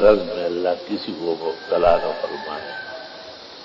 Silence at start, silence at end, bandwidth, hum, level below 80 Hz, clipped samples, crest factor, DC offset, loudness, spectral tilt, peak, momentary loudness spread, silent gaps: 0 s; 0 s; 7.2 kHz; none; -46 dBFS; under 0.1%; 20 dB; under 0.1%; -22 LUFS; -6 dB/octave; -2 dBFS; 17 LU; none